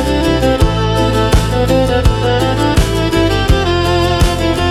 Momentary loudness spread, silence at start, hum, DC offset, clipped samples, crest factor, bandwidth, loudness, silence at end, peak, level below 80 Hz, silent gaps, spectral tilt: 1 LU; 0 s; none; under 0.1%; under 0.1%; 12 dB; 15.5 kHz; -13 LUFS; 0 s; 0 dBFS; -18 dBFS; none; -5.5 dB/octave